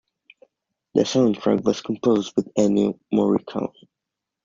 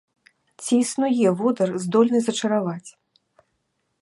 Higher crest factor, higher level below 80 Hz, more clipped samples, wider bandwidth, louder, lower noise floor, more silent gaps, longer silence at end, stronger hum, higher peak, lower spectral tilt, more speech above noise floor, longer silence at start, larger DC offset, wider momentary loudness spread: about the same, 18 dB vs 18 dB; first, -60 dBFS vs -74 dBFS; neither; second, 7.6 kHz vs 11.5 kHz; about the same, -22 LUFS vs -21 LUFS; first, -84 dBFS vs -73 dBFS; neither; second, 0.75 s vs 1.1 s; neither; about the same, -4 dBFS vs -4 dBFS; about the same, -6 dB/octave vs -5.5 dB/octave; first, 64 dB vs 53 dB; first, 0.95 s vs 0.6 s; neither; second, 6 LU vs 9 LU